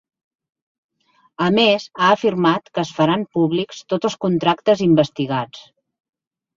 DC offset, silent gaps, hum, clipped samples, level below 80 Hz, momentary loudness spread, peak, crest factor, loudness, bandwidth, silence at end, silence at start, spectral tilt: under 0.1%; none; none; under 0.1%; -60 dBFS; 9 LU; -2 dBFS; 18 dB; -18 LUFS; 7.6 kHz; 0.95 s; 1.4 s; -6 dB/octave